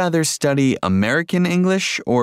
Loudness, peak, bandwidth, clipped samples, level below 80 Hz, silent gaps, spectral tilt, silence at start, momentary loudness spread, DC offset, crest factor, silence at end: -18 LUFS; -4 dBFS; 15.5 kHz; under 0.1%; -56 dBFS; none; -5 dB/octave; 0 s; 1 LU; under 0.1%; 12 dB; 0 s